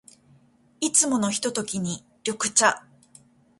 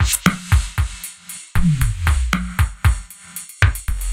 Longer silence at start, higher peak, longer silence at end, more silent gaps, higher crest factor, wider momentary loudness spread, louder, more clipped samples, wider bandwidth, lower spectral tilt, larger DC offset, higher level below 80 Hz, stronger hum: first, 0.8 s vs 0 s; second, -4 dBFS vs 0 dBFS; first, 0.8 s vs 0 s; neither; about the same, 22 dB vs 18 dB; about the same, 12 LU vs 14 LU; second, -23 LUFS vs -20 LUFS; neither; second, 11.5 kHz vs 16.5 kHz; second, -2 dB/octave vs -4.5 dB/octave; neither; second, -66 dBFS vs -22 dBFS; neither